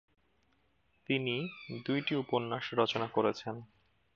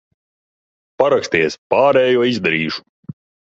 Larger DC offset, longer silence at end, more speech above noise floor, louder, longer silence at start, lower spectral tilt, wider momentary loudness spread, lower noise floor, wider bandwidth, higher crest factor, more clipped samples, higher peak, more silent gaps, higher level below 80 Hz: neither; second, 0.5 s vs 0.7 s; second, 40 dB vs over 75 dB; second, -34 LUFS vs -16 LUFS; about the same, 1.1 s vs 1 s; about the same, -6 dB/octave vs -5 dB/octave; first, 10 LU vs 7 LU; second, -74 dBFS vs under -90 dBFS; about the same, 7.2 kHz vs 7.8 kHz; first, 22 dB vs 16 dB; neither; second, -14 dBFS vs -2 dBFS; second, none vs 1.58-1.70 s; second, -76 dBFS vs -56 dBFS